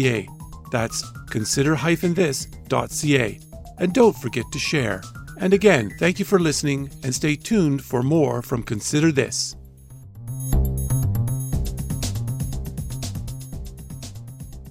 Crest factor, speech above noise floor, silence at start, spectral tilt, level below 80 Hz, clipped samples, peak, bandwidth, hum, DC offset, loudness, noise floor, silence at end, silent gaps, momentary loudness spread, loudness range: 20 dB; 22 dB; 0 s; -5 dB/octave; -34 dBFS; under 0.1%; -2 dBFS; 16 kHz; none; under 0.1%; -22 LUFS; -43 dBFS; 0 s; none; 18 LU; 6 LU